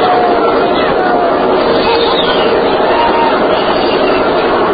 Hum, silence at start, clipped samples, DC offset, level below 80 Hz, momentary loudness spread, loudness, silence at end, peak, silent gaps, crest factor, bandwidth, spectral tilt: none; 0 s; under 0.1%; under 0.1%; -36 dBFS; 1 LU; -10 LUFS; 0 s; 0 dBFS; none; 10 dB; 5 kHz; -8.5 dB/octave